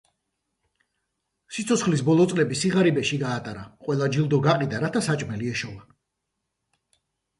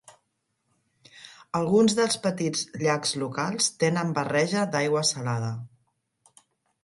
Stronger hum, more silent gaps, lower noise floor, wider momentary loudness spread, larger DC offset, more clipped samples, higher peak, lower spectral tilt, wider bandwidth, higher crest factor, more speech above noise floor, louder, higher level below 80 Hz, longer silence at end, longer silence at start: neither; neither; first, -81 dBFS vs -76 dBFS; about the same, 12 LU vs 10 LU; neither; neither; about the same, -8 dBFS vs -8 dBFS; first, -5.5 dB/octave vs -4 dB/octave; about the same, 11.5 kHz vs 11.5 kHz; about the same, 18 dB vs 18 dB; first, 57 dB vs 51 dB; about the same, -23 LUFS vs -25 LUFS; first, -60 dBFS vs -68 dBFS; first, 1.55 s vs 1.15 s; first, 1.5 s vs 1.15 s